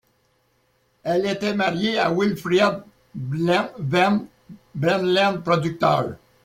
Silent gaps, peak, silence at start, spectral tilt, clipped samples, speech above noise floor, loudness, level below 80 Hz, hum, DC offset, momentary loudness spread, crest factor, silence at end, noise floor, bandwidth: none; -4 dBFS; 1.05 s; -6 dB/octave; under 0.1%; 44 dB; -21 LUFS; -58 dBFS; none; under 0.1%; 13 LU; 20 dB; 0.3 s; -65 dBFS; 16 kHz